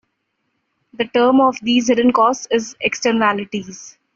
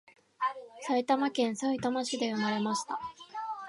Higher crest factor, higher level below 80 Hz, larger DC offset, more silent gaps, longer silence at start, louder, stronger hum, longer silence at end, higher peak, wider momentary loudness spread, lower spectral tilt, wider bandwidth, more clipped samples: about the same, 16 dB vs 18 dB; first, -58 dBFS vs -74 dBFS; neither; neither; first, 1 s vs 0.4 s; first, -16 LUFS vs -32 LUFS; neither; first, 0.25 s vs 0 s; first, -2 dBFS vs -14 dBFS; about the same, 13 LU vs 11 LU; about the same, -3.5 dB/octave vs -4 dB/octave; second, 7.4 kHz vs 11.5 kHz; neither